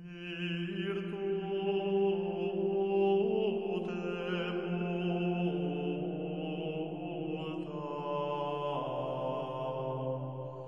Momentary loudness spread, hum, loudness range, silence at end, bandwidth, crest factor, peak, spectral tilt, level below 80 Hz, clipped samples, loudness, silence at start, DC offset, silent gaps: 8 LU; none; 5 LU; 0 s; 6.2 kHz; 14 dB; -20 dBFS; -8.5 dB/octave; -70 dBFS; under 0.1%; -35 LUFS; 0 s; under 0.1%; none